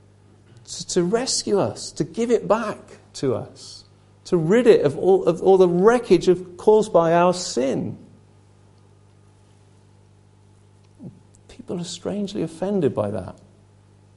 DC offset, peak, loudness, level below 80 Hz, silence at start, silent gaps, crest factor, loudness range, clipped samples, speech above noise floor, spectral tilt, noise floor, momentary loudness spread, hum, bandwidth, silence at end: under 0.1%; -2 dBFS; -20 LUFS; -54 dBFS; 0.7 s; none; 20 dB; 16 LU; under 0.1%; 33 dB; -5.5 dB/octave; -53 dBFS; 17 LU; 50 Hz at -50 dBFS; 11.5 kHz; 0.85 s